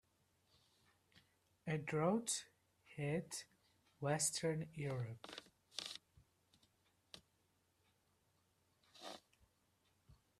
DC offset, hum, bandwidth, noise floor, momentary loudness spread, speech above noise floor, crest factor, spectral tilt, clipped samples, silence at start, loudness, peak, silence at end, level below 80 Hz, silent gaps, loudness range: under 0.1%; none; 14 kHz; -80 dBFS; 23 LU; 39 dB; 26 dB; -4 dB/octave; under 0.1%; 1.65 s; -43 LUFS; -22 dBFS; 0.25 s; -80 dBFS; none; 21 LU